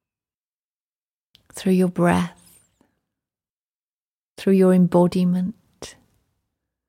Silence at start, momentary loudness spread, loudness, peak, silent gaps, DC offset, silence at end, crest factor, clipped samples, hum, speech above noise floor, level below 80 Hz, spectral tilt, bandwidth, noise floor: 1.55 s; 24 LU; -19 LUFS; -6 dBFS; 3.50-4.36 s; under 0.1%; 1 s; 18 dB; under 0.1%; none; over 72 dB; -58 dBFS; -7.5 dB/octave; 15 kHz; under -90 dBFS